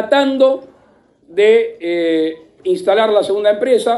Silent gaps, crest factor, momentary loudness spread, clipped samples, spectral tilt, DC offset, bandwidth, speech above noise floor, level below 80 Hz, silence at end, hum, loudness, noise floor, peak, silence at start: none; 14 dB; 10 LU; under 0.1%; -4.5 dB/octave; under 0.1%; 11.5 kHz; 38 dB; -64 dBFS; 0 s; none; -15 LUFS; -52 dBFS; 0 dBFS; 0 s